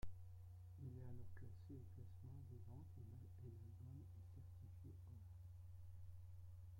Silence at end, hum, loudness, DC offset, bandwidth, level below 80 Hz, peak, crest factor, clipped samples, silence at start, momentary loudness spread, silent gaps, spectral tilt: 0 s; none; -60 LUFS; under 0.1%; 16.5 kHz; -68 dBFS; -38 dBFS; 18 dB; under 0.1%; 0 s; 3 LU; none; -8.5 dB/octave